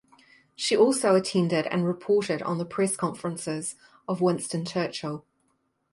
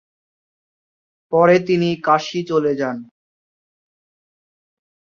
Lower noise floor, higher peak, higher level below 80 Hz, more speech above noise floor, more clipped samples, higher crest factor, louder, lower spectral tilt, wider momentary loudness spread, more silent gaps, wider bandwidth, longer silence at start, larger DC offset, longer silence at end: second, -72 dBFS vs under -90 dBFS; second, -8 dBFS vs -2 dBFS; second, -70 dBFS vs -64 dBFS; second, 47 dB vs over 73 dB; neither; about the same, 18 dB vs 20 dB; second, -26 LUFS vs -17 LUFS; second, -5 dB/octave vs -6.5 dB/octave; about the same, 12 LU vs 10 LU; neither; first, 11.5 kHz vs 7.4 kHz; second, 0.6 s vs 1.3 s; neither; second, 0.75 s vs 2 s